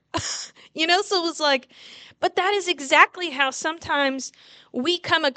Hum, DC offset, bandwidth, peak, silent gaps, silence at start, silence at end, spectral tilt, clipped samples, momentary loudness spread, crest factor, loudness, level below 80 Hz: none; under 0.1%; 9.4 kHz; 0 dBFS; none; 0.15 s; 0.05 s; -2 dB/octave; under 0.1%; 13 LU; 24 dB; -22 LUFS; -62 dBFS